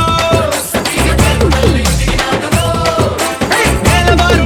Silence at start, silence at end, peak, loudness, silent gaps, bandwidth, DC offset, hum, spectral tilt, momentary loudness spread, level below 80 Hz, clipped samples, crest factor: 0 s; 0 s; 0 dBFS; -12 LUFS; none; 20 kHz; under 0.1%; none; -4.5 dB/octave; 5 LU; -18 dBFS; under 0.1%; 12 dB